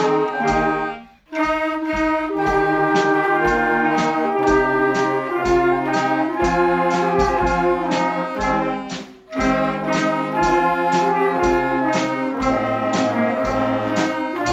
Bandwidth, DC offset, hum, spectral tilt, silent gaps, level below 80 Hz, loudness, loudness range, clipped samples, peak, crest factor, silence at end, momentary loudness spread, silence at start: 14 kHz; under 0.1%; none; -5.5 dB/octave; none; -38 dBFS; -19 LUFS; 2 LU; under 0.1%; -4 dBFS; 14 dB; 0 s; 5 LU; 0 s